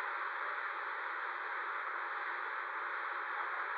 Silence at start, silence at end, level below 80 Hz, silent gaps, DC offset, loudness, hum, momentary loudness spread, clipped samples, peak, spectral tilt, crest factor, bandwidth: 0 s; 0 s; under -90 dBFS; none; under 0.1%; -39 LUFS; none; 1 LU; under 0.1%; -28 dBFS; 7 dB/octave; 12 dB; 7.2 kHz